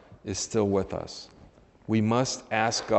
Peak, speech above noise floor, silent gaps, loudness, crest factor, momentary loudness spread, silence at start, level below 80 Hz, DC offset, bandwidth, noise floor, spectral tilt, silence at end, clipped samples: -8 dBFS; 28 dB; none; -28 LUFS; 20 dB; 17 LU; 0.1 s; -58 dBFS; under 0.1%; 8.4 kHz; -55 dBFS; -4.5 dB/octave; 0 s; under 0.1%